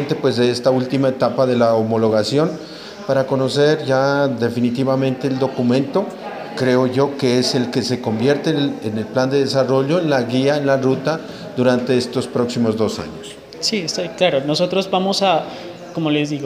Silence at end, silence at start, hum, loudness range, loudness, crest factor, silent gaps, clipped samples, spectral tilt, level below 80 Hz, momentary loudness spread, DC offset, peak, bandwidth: 0 s; 0 s; none; 2 LU; -18 LUFS; 16 dB; none; under 0.1%; -5.5 dB/octave; -58 dBFS; 8 LU; under 0.1%; -2 dBFS; 15 kHz